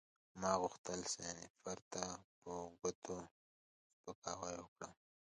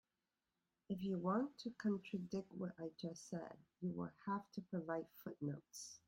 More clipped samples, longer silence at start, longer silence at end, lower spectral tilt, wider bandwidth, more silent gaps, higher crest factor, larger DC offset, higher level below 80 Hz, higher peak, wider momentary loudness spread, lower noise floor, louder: neither; second, 0.35 s vs 0.9 s; first, 0.45 s vs 0.1 s; second, -3 dB/octave vs -6.5 dB/octave; second, 10.5 kHz vs 16 kHz; first, 0.78-0.84 s, 1.50-1.54 s, 1.82-1.91 s, 2.24-2.42 s, 2.95-3.02 s, 3.31-4.04 s, 4.15-4.22 s, 4.68-4.76 s vs none; first, 26 dB vs 18 dB; neither; first, -74 dBFS vs -82 dBFS; first, -22 dBFS vs -28 dBFS; first, 16 LU vs 9 LU; about the same, under -90 dBFS vs under -90 dBFS; about the same, -46 LUFS vs -46 LUFS